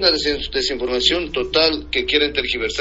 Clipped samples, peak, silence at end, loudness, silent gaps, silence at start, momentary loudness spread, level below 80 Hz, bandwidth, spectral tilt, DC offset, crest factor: under 0.1%; -2 dBFS; 0 s; -18 LUFS; none; 0 s; 5 LU; -38 dBFS; 8 kHz; -0.5 dB/octave; under 0.1%; 18 dB